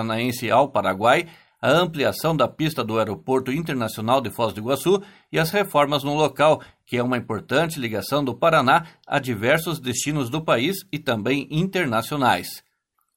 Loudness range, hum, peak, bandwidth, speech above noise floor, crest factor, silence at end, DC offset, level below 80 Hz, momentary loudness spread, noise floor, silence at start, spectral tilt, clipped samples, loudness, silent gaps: 2 LU; none; -2 dBFS; 17 kHz; 50 dB; 20 dB; 0.55 s; under 0.1%; -56 dBFS; 7 LU; -72 dBFS; 0 s; -5 dB/octave; under 0.1%; -22 LUFS; none